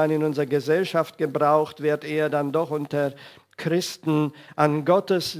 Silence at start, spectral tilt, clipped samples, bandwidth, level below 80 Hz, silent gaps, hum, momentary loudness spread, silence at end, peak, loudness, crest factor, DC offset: 0 s; -6 dB/octave; under 0.1%; 16 kHz; -72 dBFS; none; none; 6 LU; 0 s; -4 dBFS; -24 LUFS; 20 dB; under 0.1%